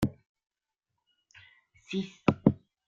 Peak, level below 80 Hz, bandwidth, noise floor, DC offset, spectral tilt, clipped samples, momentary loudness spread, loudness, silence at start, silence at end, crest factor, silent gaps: -6 dBFS; -58 dBFS; 15.5 kHz; -86 dBFS; under 0.1%; -7.5 dB/octave; under 0.1%; 10 LU; -30 LUFS; 0 s; 0.35 s; 28 dB; 0.26-0.35 s